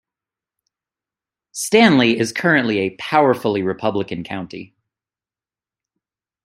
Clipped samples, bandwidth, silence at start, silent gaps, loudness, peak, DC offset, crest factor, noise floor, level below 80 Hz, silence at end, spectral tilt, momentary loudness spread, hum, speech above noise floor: under 0.1%; 15.5 kHz; 1.55 s; none; -17 LUFS; -2 dBFS; under 0.1%; 20 dB; under -90 dBFS; -62 dBFS; 1.8 s; -4.5 dB/octave; 16 LU; none; over 73 dB